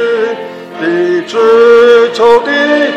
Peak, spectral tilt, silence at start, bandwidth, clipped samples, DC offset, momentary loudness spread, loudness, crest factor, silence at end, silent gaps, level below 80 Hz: 0 dBFS; -4.5 dB/octave; 0 s; 8.4 kHz; 2%; under 0.1%; 12 LU; -8 LUFS; 8 dB; 0 s; none; -52 dBFS